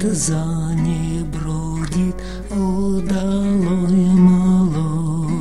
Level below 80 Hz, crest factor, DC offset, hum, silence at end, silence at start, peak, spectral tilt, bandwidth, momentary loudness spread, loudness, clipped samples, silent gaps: -32 dBFS; 14 dB; 3%; none; 0 s; 0 s; -2 dBFS; -7 dB/octave; 12 kHz; 11 LU; -18 LUFS; under 0.1%; none